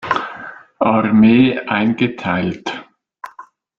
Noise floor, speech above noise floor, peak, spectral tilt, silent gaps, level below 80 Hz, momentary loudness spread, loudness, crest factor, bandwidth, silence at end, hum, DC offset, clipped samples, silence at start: -42 dBFS; 28 dB; -2 dBFS; -7.5 dB/octave; none; -52 dBFS; 24 LU; -15 LUFS; 16 dB; 7 kHz; 0.35 s; none; under 0.1%; under 0.1%; 0 s